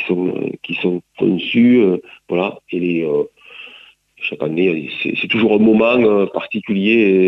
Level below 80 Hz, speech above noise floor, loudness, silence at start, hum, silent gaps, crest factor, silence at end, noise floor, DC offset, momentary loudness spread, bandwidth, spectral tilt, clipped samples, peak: -58 dBFS; 29 dB; -16 LUFS; 0 s; none; none; 14 dB; 0 s; -45 dBFS; under 0.1%; 12 LU; 5.6 kHz; -8.5 dB/octave; under 0.1%; -2 dBFS